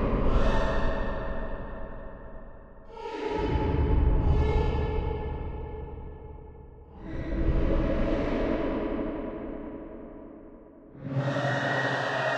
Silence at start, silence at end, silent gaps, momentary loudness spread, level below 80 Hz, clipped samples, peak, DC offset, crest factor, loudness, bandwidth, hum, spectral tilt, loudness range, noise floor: 0 s; 0 s; none; 21 LU; -32 dBFS; under 0.1%; -12 dBFS; under 0.1%; 16 dB; -30 LUFS; 8 kHz; none; -7.5 dB/octave; 4 LU; -49 dBFS